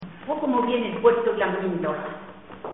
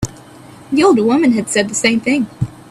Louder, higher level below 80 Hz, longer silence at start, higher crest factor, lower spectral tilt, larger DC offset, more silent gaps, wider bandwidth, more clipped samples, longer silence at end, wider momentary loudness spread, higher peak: second, -24 LUFS vs -14 LUFS; second, -60 dBFS vs -44 dBFS; about the same, 0 s vs 0 s; about the same, 18 dB vs 14 dB; about the same, -4.5 dB/octave vs -4.5 dB/octave; first, 0.2% vs under 0.1%; neither; second, 4 kHz vs 14 kHz; neither; second, 0 s vs 0.2 s; first, 18 LU vs 11 LU; second, -6 dBFS vs 0 dBFS